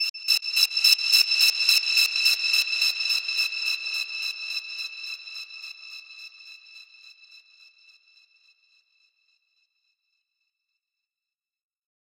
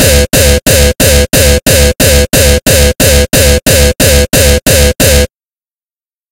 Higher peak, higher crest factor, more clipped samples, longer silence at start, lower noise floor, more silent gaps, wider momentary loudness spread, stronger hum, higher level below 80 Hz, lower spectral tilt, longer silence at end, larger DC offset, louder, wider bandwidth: second, -4 dBFS vs 0 dBFS; first, 24 dB vs 6 dB; second, under 0.1% vs 4%; about the same, 0 s vs 0 s; about the same, under -90 dBFS vs under -90 dBFS; first, 0.10-0.14 s vs none; first, 21 LU vs 1 LU; neither; second, under -90 dBFS vs -12 dBFS; second, 8 dB/octave vs -3.5 dB/octave; first, 5 s vs 1.05 s; second, under 0.1% vs 0.3%; second, -21 LUFS vs -6 LUFS; second, 17 kHz vs over 20 kHz